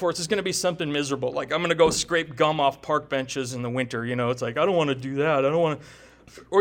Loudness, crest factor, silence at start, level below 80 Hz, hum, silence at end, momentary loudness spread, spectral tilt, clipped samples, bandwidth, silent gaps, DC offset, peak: -24 LUFS; 18 dB; 0 s; -56 dBFS; none; 0 s; 7 LU; -4 dB/octave; under 0.1%; 17 kHz; none; under 0.1%; -6 dBFS